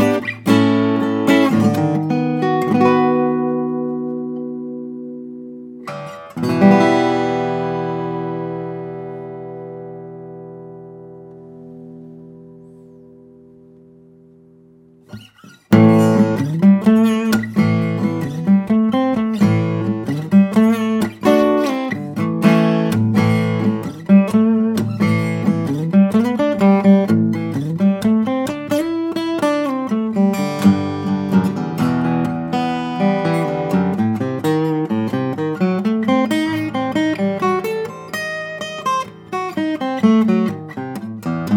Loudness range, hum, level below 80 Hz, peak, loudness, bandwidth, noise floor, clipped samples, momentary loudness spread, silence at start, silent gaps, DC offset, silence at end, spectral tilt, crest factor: 9 LU; none; -58 dBFS; 0 dBFS; -17 LUFS; 16.5 kHz; -48 dBFS; under 0.1%; 17 LU; 0 s; none; under 0.1%; 0 s; -7.5 dB/octave; 18 dB